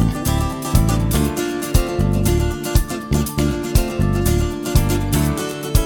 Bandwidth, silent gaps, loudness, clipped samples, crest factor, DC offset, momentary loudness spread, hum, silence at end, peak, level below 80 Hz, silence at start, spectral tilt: over 20 kHz; none; -19 LUFS; under 0.1%; 16 dB; under 0.1%; 3 LU; none; 0 s; -2 dBFS; -22 dBFS; 0 s; -5.5 dB/octave